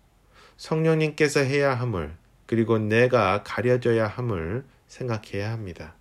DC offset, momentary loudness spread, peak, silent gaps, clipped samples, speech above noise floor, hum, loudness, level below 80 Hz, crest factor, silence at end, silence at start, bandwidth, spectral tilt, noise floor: under 0.1%; 14 LU; -8 dBFS; none; under 0.1%; 31 dB; none; -24 LUFS; -52 dBFS; 18 dB; 0.1 s; 0.6 s; 14 kHz; -6.5 dB/octave; -55 dBFS